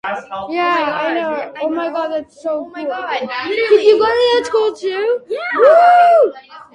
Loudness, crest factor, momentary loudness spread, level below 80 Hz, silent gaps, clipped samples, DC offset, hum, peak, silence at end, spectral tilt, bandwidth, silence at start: -15 LUFS; 14 dB; 14 LU; -58 dBFS; none; under 0.1%; under 0.1%; none; 0 dBFS; 0.15 s; -3.5 dB/octave; 10 kHz; 0.05 s